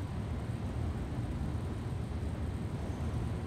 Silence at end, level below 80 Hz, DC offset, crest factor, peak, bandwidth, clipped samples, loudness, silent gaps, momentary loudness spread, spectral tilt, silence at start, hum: 0 s; -44 dBFS; under 0.1%; 12 dB; -24 dBFS; 13 kHz; under 0.1%; -38 LUFS; none; 1 LU; -7.5 dB/octave; 0 s; none